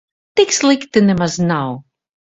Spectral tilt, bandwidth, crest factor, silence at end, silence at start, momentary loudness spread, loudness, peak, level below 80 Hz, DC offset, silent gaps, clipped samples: -4.5 dB/octave; 8.4 kHz; 16 dB; 0.55 s; 0.35 s; 9 LU; -15 LUFS; 0 dBFS; -50 dBFS; under 0.1%; none; under 0.1%